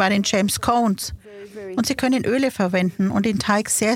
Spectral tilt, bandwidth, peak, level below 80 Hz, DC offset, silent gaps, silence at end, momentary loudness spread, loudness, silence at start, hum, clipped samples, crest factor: -4 dB/octave; 16.5 kHz; -4 dBFS; -48 dBFS; under 0.1%; none; 0 s; 11 LU; -20 LUFS; 0 s; none; under 0.1%; 16 dB